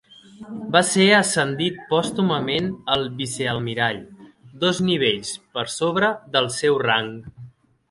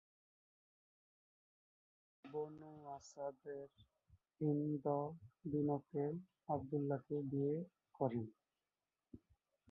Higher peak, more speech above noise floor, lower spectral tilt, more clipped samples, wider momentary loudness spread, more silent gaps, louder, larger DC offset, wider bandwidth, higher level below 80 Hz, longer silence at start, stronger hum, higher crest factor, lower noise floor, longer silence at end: first, 0 dBFS vs -24 dBFS; second, 24 dB vs over 47 dB; second, -4 dB/octave vs -10 dB/octave; neither; about the same, 12 LU vs 14 LU; neither; first, -21 LUFS vs -44 LUFS; neither; first, 11.5 kHz vs 5.6 kHz; first, -56 dBFS vs -78 dBFS; second, 0.4 s vs 2.25 s; neither; about the same, 22 dB vs 20 dB; second, -45 dBFS vs under -90 dBFS; second, 0.4 s vs 0.55 s